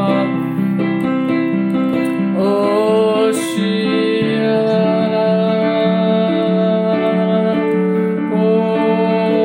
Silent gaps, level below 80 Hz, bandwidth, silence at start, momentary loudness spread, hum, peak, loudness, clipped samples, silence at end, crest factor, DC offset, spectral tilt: none; -62 dBFS; 16.5 kHz; 0 s; 3 LU; none; -4 dBFS; -15 LUFS; under 0.1%; 0 s; 12 dB; under 0.1%; -7 dB/octave